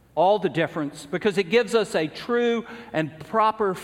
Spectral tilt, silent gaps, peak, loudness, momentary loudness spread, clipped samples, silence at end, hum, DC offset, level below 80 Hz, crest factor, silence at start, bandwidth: -5.5 dB/octave; none; -8 dBFS; -24 LUFS; 8 LU; under 0.1%; 0 s; none; under 0.1%; -62 dBFS; 16 dB; 0.15 s; 14.5 kHz